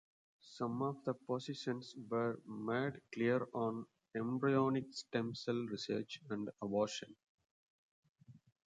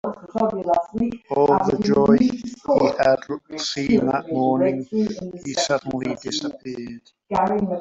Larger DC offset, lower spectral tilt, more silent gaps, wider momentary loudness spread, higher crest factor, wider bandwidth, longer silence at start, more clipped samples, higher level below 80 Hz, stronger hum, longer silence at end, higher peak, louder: neither; about the same, -6 dB/octave vs -5.5 dB/octave; first, 7.29-7.38 s, 7.51-8.03 s, 8.09-8.15 s vs none; second, 9 LU vs 12 LU; about the same, 20 dB vs 18 dB; first, 9.4 kHz vs 8 kHz; first, 0.45 s vs 0.05 s; neither; second, -80 dBFS vs -52 dBFS; neither; first, 0.3 s vs 0 s; second, -20 dBFS vs -4 dBFS; second, -40 LUFS vs -21 LUFS